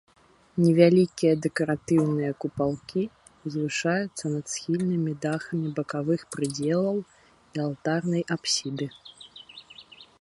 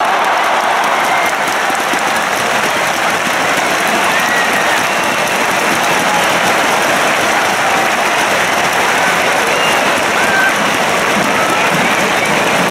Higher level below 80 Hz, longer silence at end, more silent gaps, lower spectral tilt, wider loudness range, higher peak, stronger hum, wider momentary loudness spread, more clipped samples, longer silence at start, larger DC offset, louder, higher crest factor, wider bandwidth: second, -64 dBFS vs -50 dBFS; first, 0.15 s vs 0 s; neither; first, -5.5 dB/octave vs -2 dB/octave; first, 5 LU vs 1 LU; second, -4 dBFS vs 0 dBFS; neither; first, 17 LU vs 2 LU; neither; first, 0.55 s vs 0 s; neither; second, -26 LUFS vs -12 LUFS; first, 22 dB vs 12 dB; second, 11.5 kHz vs 16.5 kHz